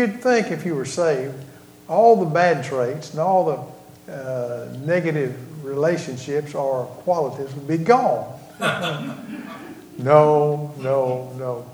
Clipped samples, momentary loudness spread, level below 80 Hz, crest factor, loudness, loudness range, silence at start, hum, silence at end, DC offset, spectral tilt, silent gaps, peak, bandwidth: under 0.1%; 18 LU; -66 dBFS; 22 dB; -21 LUFS; 4 LU; 0 s; none; 0 s; under 0.1%; -6 dB/octave; none; 0 dBFS; over 20 kHz